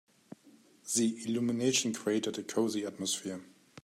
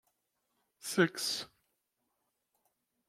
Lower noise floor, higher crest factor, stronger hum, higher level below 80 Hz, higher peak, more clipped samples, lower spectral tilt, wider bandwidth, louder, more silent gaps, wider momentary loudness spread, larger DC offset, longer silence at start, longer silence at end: second, -61 dBFS vs -83 dBFS; second, 18 dB vs 26 dB; neither; about the same, -80 dBFS vs -84 dBFS; about the same, -16 dBFS vs -14 dBFS; neither; about the same, -3.5 dB/octave vs -3.5 dB/octave; about the same, 16 kHz vs 16.5 kHz; about the same, -32 LUFS vs -33 LUFS; neither; second, 8 LU vs 16 LU; neither; second, 0.45 s vs 0.85 s; second, 0.35 s vs 1.65 s